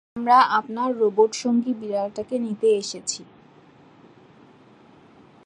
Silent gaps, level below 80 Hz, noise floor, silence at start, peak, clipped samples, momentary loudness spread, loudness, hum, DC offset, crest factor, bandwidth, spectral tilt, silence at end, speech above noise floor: none; -70 dBFS; -52 dBFS; 0.15 s; -6 dBFS; under 0.1%; 11 LU; -22 LUFS; none; under 0.1%; 18 dB; 10.5 kHz; -3.5 dB/octave; 2.25 s; 30 dB